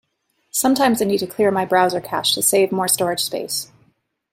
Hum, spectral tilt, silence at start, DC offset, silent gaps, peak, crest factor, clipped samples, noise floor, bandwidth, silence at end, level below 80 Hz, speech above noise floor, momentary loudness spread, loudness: none; -3 dB/octave; 0.55 s; under 0.1%; none; -2 dBFS; 18 dB; under 0.1%; -68 dBFS; 16.5 kHz; 0.7 s; -62 dBFS; 50 dB; 9 LU; -18 LUFS